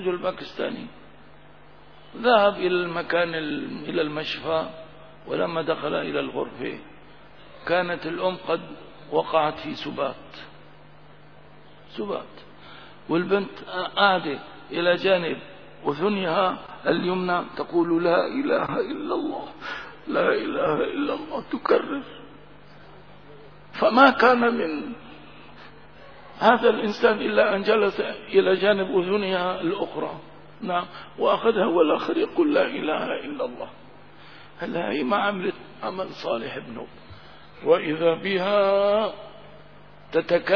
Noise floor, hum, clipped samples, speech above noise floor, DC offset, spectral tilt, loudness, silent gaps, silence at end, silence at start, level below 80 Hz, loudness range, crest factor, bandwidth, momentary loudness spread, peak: -51 dBFS; none; under 0.1%; 27 dB; 0.4%; -7 dB/octave; -24 LUFS; none; 0 s; 0 s; -60 dBFS; 7 LU; 24 dB; 5.4 kHz; 18 LU; 0 dBFS